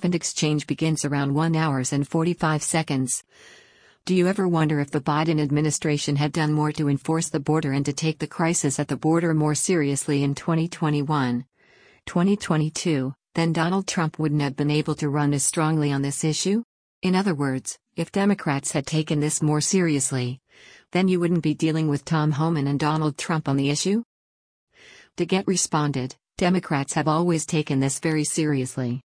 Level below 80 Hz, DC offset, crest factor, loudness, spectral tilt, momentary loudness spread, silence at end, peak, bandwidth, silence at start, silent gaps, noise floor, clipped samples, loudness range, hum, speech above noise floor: -58 dBFS; under 0.1%; 16 dB; -23 LUFS; -5 dB/octave; 5 LU; 0.2 s; -8 dBFS; 10.5 kHz; 0 s; 16.64-17.02 s, 24.05-24.67 s; -56 dBFS; under 0.1%; 2 LU; none; 33 dB